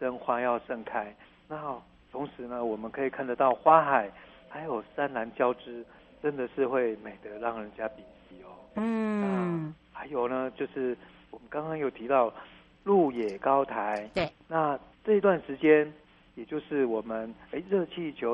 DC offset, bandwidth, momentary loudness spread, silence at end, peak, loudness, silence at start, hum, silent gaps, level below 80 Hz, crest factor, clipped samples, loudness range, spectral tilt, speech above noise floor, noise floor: under 0.1%; 8.4 kHz; 15 LU; 0 s; -6 dBFS; -30 LUFS; 0 s; none; none; -64 dBFS; 24 dB; under 0.1%; 6 LU; -8 dB/octave; 21 dB; -50 dBFS